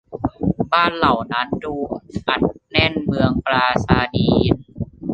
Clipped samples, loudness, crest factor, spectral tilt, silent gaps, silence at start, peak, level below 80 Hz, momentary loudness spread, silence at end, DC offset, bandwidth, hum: under 0.1%; -19 LUFS; 18 dB; -7 dB/octave; none; 0.1 s; -2 dBFS; -36 dBFS; 9 LU; 0 s; under 0.1%; 8.6 kHz; none